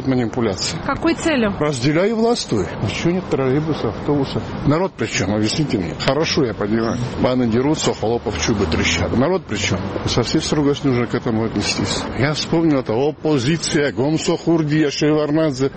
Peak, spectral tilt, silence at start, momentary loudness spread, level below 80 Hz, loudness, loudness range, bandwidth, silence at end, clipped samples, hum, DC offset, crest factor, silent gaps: 0 dBFS; -5 dB/octave; 0 s; 4 LU; -40 dBFS; -19 LUFS; 2 LU; 8.8 kHz; 0 s; under 0.1%; none; 0.2%; 18 dB; none